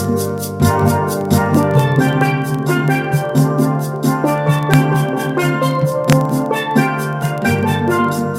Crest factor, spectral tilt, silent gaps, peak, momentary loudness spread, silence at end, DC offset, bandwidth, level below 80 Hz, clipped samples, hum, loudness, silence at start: 14 dB; -6.5 dB/octave; none; 0 dBFS; 4 LU; 0 s; under 0.1%; 16.5 kHz; -46 dBFS; under 0.1%; none; -15 LUFS; 0 s